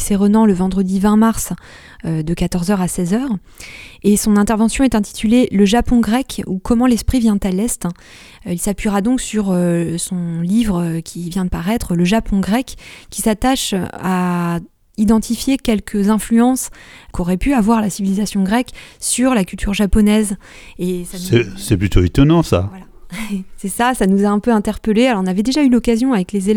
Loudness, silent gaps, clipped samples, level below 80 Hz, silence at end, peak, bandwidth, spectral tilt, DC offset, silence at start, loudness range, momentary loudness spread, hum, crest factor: -16 LUFS; none; under 0.1%; -30 dBFS; 0 s; 0 dBFS; 17.5 kHz; -5.5 dB/octave; under 0.1%; 0 s; 3 LU; 12 LU; none; 16 dB